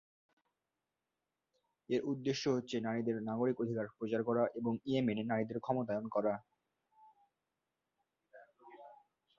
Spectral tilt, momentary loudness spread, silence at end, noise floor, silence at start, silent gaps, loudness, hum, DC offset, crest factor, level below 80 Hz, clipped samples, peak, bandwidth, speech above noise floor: -5.5 dB/octave; 4 LU; 0.45 s; -90 dBFS; 1.9 s; none; -37 LUFS; none; under 0.1%; 20 dB; -78 dBFS; under 0.1%; -20 dBFS; 7.2 kHz; 54 dB